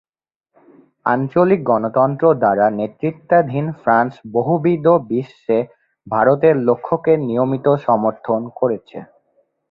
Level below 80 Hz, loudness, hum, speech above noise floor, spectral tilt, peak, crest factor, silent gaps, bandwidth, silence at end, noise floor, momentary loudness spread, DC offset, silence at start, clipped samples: -60 dBFS; -17 LUFS; none; 61 dB; -10.5 dB/octave; -2 dBFS; 16 dB; none; 5.2 kHz; 0.65 s; -77 dBFS; 9 LU; under 0.1%; 1.05 s; under 0.1%